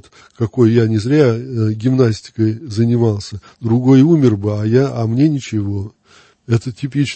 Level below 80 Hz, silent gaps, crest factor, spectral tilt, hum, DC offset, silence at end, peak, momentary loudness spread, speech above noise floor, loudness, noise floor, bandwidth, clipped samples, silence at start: -52 dBFS; none; 14 dB; -8 dB/octave; none; under 0.1%; 0 s; 0 dBFS; 11 LU; 35 dB; -15 LUFS; -49 dBFS; 8.6 kHz; under 0.1%; 0.4 s